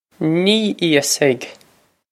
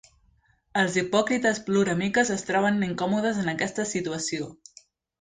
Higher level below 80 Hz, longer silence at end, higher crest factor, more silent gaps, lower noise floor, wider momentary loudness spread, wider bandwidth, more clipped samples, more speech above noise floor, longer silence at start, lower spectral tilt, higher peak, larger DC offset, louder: second, -68 dBFS vs -62 dBFS; about the same, 0.6 s vs 0.65 s; about the same, 18 dB vs 18 dB; neither; second, -55 dBFS vs -64 dBFS; about the same, 8 LU vs 6 LU; first, 15.5 kHz vs 9.6 kHz; neither; about the same, 39 dB vs 39 dB; second, 0.2 s vs 0.75 s; about the same, -3.5 dB/octave vs -4.5 dB/octave; first, 0 dBFS vs -10 dBFS; neither; first, -16 LUFS vs -25 LUFS